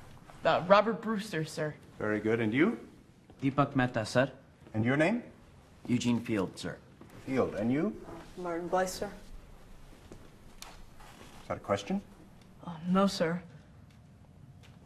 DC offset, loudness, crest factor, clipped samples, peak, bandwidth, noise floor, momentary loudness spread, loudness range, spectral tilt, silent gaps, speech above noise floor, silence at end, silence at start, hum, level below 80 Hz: under 0.1%; -31 LUFS; 26 dB; under 0.1%; -6 dBFS; 14 kHz; -56 dBFS; 21 LU; 9 LU; -6 dB/octave; none; 26 dB; 0.35 s; 0 s; none; -58 dBFS